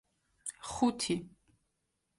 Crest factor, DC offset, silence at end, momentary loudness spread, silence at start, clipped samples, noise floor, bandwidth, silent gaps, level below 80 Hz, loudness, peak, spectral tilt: 20 dB; under 0.1%; 0.9 s; 13 LU; 0.45 s; under 0.1%; -82 dBFS; 11.5 kHz; none; -64 dBFS; -35 LUFS; -16 dBFS; -4 dB/octave